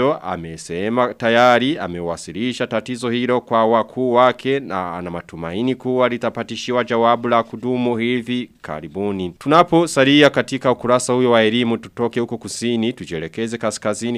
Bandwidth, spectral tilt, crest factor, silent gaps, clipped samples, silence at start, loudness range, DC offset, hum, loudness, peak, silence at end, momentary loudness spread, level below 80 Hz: 14 kHz; -5 dB/octave; 18 dB; none; under 0.1%; 0 s; 4 LU; under 0.1%; none; -18 LUFS; 0 dBFS; 0 s; 13 LU; -54 dBFS